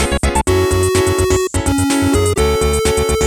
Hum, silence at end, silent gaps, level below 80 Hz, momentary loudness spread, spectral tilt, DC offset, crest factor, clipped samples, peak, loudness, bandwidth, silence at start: none; 0 s; none; -24 dBFS; 2 LU; -4.5 dB/octave; under 0.1%; 12 dB; under 0.1%; -2 dBFS; -14 LUFS; over 20 kHz; 0 s